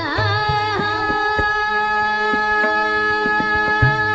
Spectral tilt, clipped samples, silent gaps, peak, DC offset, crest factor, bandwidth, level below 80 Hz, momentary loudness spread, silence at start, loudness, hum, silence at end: -5.5 dB/octave; under 0.1%; none; -2 dBFS; under 0.1%; 16 dB; 8.2 kHz; -38 dBFS; 3 LU; 0 s; -17 LUFS; none; 0 s